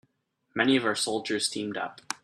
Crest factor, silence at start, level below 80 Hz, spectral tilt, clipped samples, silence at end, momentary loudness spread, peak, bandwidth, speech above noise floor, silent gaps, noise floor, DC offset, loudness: 22 dB; 0.55 s; -72 dBFS; -3 dB/octave; under 0.1%; 0.1 s; 11 LU; -8 dBFS; 14 kHz; 47 dB; none; -74 dBFS; under 0.1%; -28 LUFS